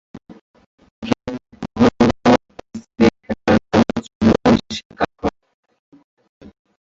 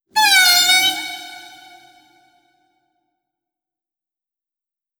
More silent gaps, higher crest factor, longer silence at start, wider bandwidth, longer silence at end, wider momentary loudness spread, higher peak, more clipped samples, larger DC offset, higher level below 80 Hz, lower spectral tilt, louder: first, 0.41-0.54 s, 0.66-0.78 s, 0.91-1.02 s, 4.15-4.20 s, 4.85-4.90 s vs none; about the same, 18 dB vs 20 dB; about the same, 0.15 s vs 0.15 s; second, 7.8 kHz vs over 20 kHz; second, 1.55 s vs 3.6 s; second, 17 LU vs 21 LU; about the same, -2 dBFS vs -2 dBFS; neither; neither; first, -42 dBFS vs -66 dBFS; first, -6.5 dB/octave vs 2.5 dB/octave; second, -17 LUFS vs -12 LUFS